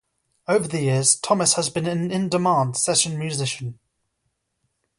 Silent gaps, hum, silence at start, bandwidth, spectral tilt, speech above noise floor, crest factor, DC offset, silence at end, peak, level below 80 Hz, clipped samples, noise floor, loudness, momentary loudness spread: none; none; 0.5 s; 11.5 kHz; -3.5 dB/octave; 53 dB; 20 dB; under 0.1%; 1.25 s; -4 dBFS; -62 dBFS; under 0.1%; -75 dBFS; -21 LUFS; 9 LU